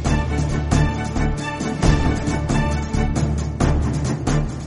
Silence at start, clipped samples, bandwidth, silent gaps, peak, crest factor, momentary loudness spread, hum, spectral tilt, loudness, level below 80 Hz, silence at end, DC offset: 0 s; under 0.1%; 11.5 kHz; none; -2 dBFS; 16 dB; 4 LU; none; -6 dB/octave; -21 LUFS; -24 dBFS; 0 s; under 0.1%